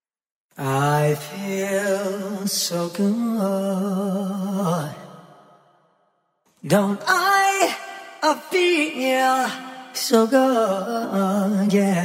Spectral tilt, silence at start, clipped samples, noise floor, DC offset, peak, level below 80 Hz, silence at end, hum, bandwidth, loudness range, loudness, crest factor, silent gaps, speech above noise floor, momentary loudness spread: -4.5 dB/octave; 0.55 s; under 0.1%; -67 dBFS; under 0.1%; -4 dBFS; -70 dBFS; 0 s; none; 16 kHz; 6 LU; -21 LUFS; 18 dB; none; 47 dB; 9 LU